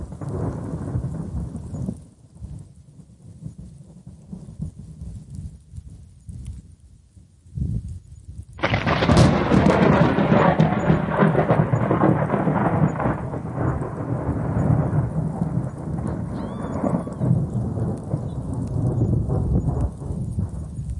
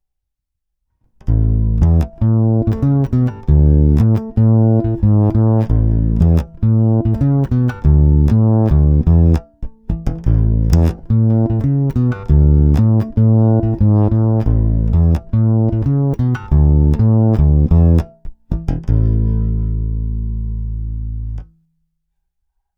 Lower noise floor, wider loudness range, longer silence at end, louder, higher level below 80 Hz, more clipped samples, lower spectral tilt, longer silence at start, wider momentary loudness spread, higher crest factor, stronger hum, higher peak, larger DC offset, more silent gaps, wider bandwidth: second, -50 dBFS vs -76 dBFS; first, 21 LU vs 4 LU; second, 0 s vs 1.35 s; second, -22 LUFS vs -14 LUFS; second, -36 dBFS vs -18 dBFS; neither; second, -8 dB/octave vs -11 dB/octave; second, 0 s vs 1.25 s; first, 22 LU vs 11 LU; about the same, 18 dB vs 14 dB; neither; second, -4 dBFS vs 0 dBFS; neither; neither; first, 11.5 kHz vs 5.8 kHz